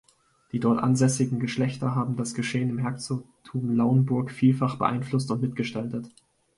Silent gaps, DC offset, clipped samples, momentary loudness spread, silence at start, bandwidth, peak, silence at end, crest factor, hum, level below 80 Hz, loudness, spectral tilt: none; under 0.1%; under 0.1%; 11 LU; 0.55 s; 11.5 kHz; -8 dBFS; 0.5 s; 18 dB; none; -62 dBFS; -26 LUFS; -6.5 dB/octave